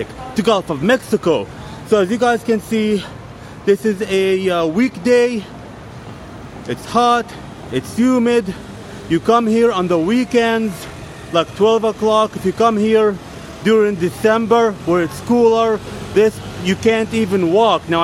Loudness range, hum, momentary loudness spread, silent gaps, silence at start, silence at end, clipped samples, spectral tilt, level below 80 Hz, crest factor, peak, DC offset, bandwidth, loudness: 3 LU; none; 18 LU; none; 0 s; 0 s; under 0.1%; -5.5 dB/octave; -46 dBFS; 16 dB; 0 dBFS; under 0.1%; 14.5 kHz; -16 LUFS